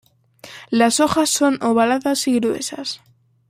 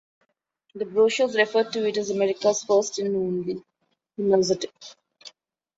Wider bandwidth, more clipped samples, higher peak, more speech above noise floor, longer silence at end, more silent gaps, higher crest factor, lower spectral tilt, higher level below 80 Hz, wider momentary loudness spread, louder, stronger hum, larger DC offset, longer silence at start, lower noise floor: first, 16 kHz vs 8 kHz; neither; first, -2 dBFS vs -6 dBFS; second, 27 dB vs 48 dB; about the same, 0.55 s vs 0.5 s; neither; about the same, 18 dB vs 18 dB; about the same, -3 dB/octave vs -4 dB/octave; first, -58 dBFS vs -68 dBFS; first, 15 LU vs 12 LU; first, -18 LUFS vs -23 LUFS; neither; neither; second, 0.45 s vs 0.75 s; second, -44 dBFS vs -71 dBFS